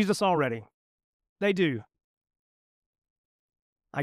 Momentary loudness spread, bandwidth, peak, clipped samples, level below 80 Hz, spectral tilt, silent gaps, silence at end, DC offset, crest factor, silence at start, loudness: 13 LU; 15 kHz; -12 dBFS; under 0.1%; -74 dBFS; -5.5 dB/octave; 0.74-0.98 s, 1.04-1.20 s, 1.29-1.36 s, 2.04-2.21 s, 2.39-3.02 s, 3.10-3.49 s, 3.62-3.76 s; 0 s; under 0.1%; 20 dB; 0 s; -28 LUFS